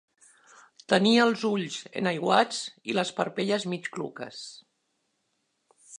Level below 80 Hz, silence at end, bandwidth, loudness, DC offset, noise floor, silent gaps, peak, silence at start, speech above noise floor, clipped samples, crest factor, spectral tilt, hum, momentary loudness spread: -76 dBFS; 0.05 s; 11 kHz; -26 LUFS; under 0.1%; -76 dBFS; none; -6 dBFS; 0.9 s; 49 dB; under 0.1%; 24 dB; -4.5 dB/octave; none; 16 LU